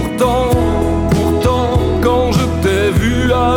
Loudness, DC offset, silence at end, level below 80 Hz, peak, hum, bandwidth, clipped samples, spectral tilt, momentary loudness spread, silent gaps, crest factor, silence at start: -14 LUFS; under 0.1%; 0 s; -22 dBFS; -2 dBFS; none; 17.5 kHz; under 0.1%; -6.5 dB/octave; 2 LU; none; 12 dB; 0 s